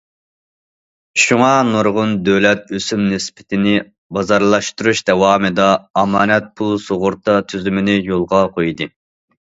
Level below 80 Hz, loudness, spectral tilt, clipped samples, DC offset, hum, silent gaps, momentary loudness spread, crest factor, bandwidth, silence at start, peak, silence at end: -48 dBFS; -15 LUFS; -4.5 dB/octave; under 0.1%; under 0.1%; none; 3.98-4.10 s, 5.90-5.94 s; 8 LU; 16 dB; 8 kHz; 1.15 s; 0 dBFS; 0.55 s